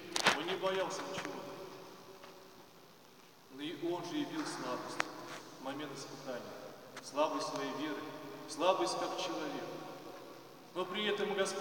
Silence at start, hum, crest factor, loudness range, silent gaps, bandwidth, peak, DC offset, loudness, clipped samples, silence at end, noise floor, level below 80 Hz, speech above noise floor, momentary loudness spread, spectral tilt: 0 s; none; 30 dB; 7 LU; none; 17 kHz; -10 dBFS; under 0.1%; -38 LUFS; under 0.1%; 0 s; -60 dBFS; -84 dBFS; 22 dB; 20 LU; -3 dB/octave